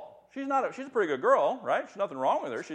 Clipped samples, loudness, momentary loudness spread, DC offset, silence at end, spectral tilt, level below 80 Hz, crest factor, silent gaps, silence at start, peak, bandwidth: under 0.1%; -29 LUFS; 9 LU; under 0.1%; 0 s; -5 dB/octave; -82 dBFS; 18 dB; none; 0 s; -10 dBFS; 9.2 kHz